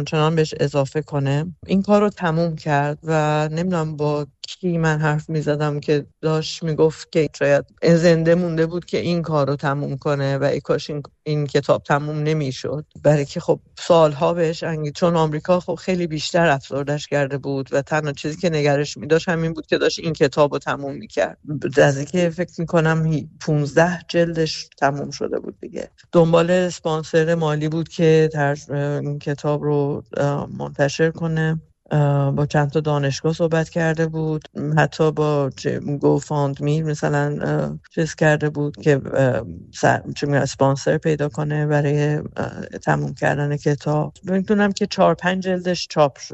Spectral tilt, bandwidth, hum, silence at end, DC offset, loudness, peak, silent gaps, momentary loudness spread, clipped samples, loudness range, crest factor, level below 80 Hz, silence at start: -6.5 dB/octave; 8.2 kHz; none; 0 s; under 0.1%; -20 LUFS; -4 dBFS; none; 7 LU; under 0.1%; 3 LU; 16 dB; -52 dBFS; 0 s